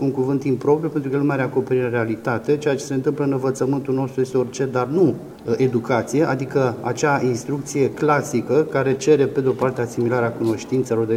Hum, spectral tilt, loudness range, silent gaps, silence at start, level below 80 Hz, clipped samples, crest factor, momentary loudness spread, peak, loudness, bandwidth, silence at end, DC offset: none; -6.5 dB/octave; 2 LU; none; 0 s; -58 dBFS; under 0.1%; 16 dB; 4 LU; -4 dBFS; -21 LUFS; 15.5 kHz; 0 s; under 0.1%